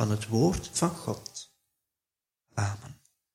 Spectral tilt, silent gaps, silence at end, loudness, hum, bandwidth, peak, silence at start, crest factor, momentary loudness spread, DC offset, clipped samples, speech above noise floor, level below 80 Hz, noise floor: -5.5 dB/octave; none; 0.4 s; -30 LUFS; none; 16 kHz; -10 dBFS; 0 s; 22 dB; 18 LU; under 0.1%; under 0.1%; over 61 dB; -52 dBFS; under -90 dBFS